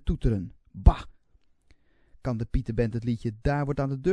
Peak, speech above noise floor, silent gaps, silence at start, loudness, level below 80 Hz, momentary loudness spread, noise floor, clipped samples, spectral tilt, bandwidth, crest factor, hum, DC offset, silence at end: -2 dBFS; 37 dB; none; 0.05 s; -28 LUFS; -30 dBFS; 13 LU; -63 dBFS; under 0.1%; -9 dB/octave; 9.6 kHz; 24 dB; none; under 0.1%; 0 s